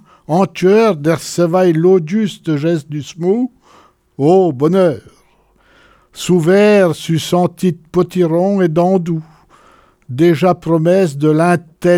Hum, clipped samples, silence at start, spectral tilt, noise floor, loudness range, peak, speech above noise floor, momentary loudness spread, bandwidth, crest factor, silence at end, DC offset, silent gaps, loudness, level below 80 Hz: none; under 0.1%; 0.3 s; -7 dB/octave; -53 dBFS; 3 LU; -2 dBFS; 40 dB; 8 LU; 15 kHz; 12 dB; 0 s; under 0.1%; none; -13 LUFS; -54 dBFS